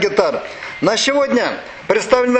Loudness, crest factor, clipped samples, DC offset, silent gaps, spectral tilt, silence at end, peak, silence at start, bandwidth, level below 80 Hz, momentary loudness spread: -17 LUFS; 16 dB; under 0.1%; under 0.1%; none; -3 dB/octave; 0 s; 0 dBFS; 0 s; 9.2 kHz; -50 dBFS; 11 LU